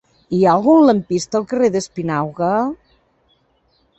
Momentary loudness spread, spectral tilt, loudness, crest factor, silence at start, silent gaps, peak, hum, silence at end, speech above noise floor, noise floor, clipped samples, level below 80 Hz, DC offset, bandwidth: 11 LU; -6.5 dB/octave; -16 LUFS; 16 dB; 0.3 s; none; -2 dBFS; none; 1.25 s; 45 dB; -61 dBFS; under 0.1%; -54 dBFS; under 0.1%; 8.4 kHz